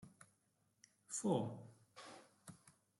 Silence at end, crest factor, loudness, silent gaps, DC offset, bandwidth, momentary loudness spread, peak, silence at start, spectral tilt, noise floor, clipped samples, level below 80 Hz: 0.3 s; 22 dB; -42 LUFS; none; under 0.1%; 12.5 kHz; 24 LU; -26 dBFS; 0 s; -5.5 dB/octave; -81 dBFS; under 0.1%; -86 dBFS